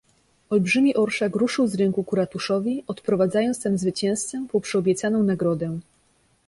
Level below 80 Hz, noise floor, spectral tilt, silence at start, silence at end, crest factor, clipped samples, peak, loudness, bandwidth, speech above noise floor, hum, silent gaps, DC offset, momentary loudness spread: -62 dBFS; -63 dBFS; -5.5 dB/octave; 0.5 s; 0.65 s; 14 dB; under 0.1%; -10 dBFS; -23 LUFS; 11.5 kHz; 41 dB; none; none; under 0.1%; 7 LU